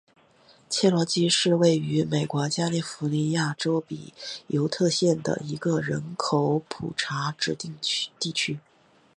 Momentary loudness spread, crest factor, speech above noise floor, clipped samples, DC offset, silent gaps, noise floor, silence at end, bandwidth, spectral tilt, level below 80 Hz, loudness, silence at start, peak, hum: 8 LU; 18 dB; 32 dB; under 0.1%; under 0.1%; none; -58 dBFS; 0.6 s; 11.5 kHz; -4.5 dB/octave; -64 dBFS; -25 LUFS; 0.7 s; -8 dBFS; none